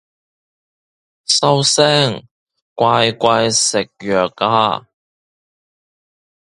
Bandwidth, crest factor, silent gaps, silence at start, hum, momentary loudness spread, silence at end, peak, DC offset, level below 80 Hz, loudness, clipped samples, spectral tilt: 11.5 kHz; 18 dB; 2.31-2.47 s, 2.62-2.76 s; 1.3 s; none; 8 LU; 1.65 s; 0 dBFS; under 0.1%; -56 dBFS; -14 LUFS; under 0.1%; -3 dB/octave